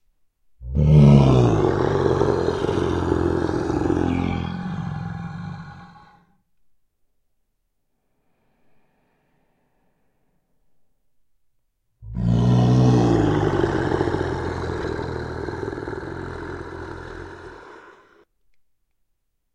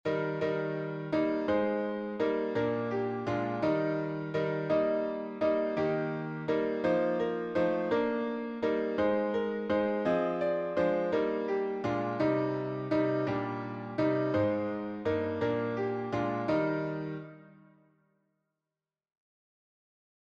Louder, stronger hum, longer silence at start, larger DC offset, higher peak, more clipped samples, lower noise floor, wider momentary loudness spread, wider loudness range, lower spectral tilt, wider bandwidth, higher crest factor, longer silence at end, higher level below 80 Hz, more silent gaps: first, -20 LUFS vs -31 LUFS; neither; first, 0.6 s vs 0.05 s; neither; first, 0 dBFS vs -16 dBFS; neither; second, -73 dBFS vs under -90 dBFS; first, 19 LU vs 6 LU; first, 18 LU vs 4 LU; about the same, -8.5 dB/octave vs -8 dB/octave; first, 9 kHz vs 7.2 kHz; first, 22 dB vs 16 dB; second, 1.65 s vs 2.7 s; first, -36 dBFS vs -66 dBFS; neither